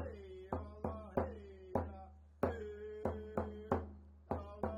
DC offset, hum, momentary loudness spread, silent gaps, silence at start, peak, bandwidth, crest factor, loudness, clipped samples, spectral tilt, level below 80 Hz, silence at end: under 0.1%; none; 12 LU; none; 0 s; -18 dBFS; 16 kHz; 24 dB; -43 LUFS; under 0.1%; -9 dB/octave; -58 dBFS; 0 s